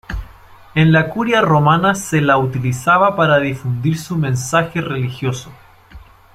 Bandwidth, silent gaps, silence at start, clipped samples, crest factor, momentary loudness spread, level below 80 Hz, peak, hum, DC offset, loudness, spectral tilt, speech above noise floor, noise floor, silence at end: 15.5 kHz; none; 0.1 s; under 0.1%; 14 dB; 10 LU; -40 dBFS; -2 dBFS; none; under 0.1%; -15 LUFS; -6 dB/octave; 26 dB; -41 dBFS; 0.35 s